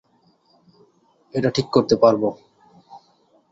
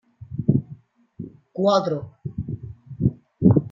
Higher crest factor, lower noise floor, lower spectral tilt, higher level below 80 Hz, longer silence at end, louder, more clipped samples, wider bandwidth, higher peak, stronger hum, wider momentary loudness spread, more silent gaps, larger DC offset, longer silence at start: about the same, 20 dB vs 20 dB; first, -61 dBFS vs -45 dBFS; second, -6 dB/octave vs -9 dB/octave; second, -58 dBFS vs -50 dBFS; first, 0.55 s vs 0.05 s; first, -19 LUFS vs -23 LUFS; neither; about the same, 7.8 kHz vs 7.2 kHz; about the same, -2 dBFS vs -2 dBFS; neither; second, 10 LU vs 21 LU; neither; neither; first, 1.35 s vs 0.2 s